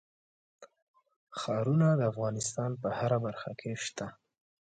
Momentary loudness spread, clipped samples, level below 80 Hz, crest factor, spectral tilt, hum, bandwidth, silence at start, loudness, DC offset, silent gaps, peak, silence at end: 13 LU; under 0.1%; -70 dBFS; 18 dB; -6 dB/octave; none; 9.4 kHz; 0.6 s; -32 LUFS; under 0.1%; 0.82-0.94 s, 1.16-1.27 s; -16 dBFS; 0.55 s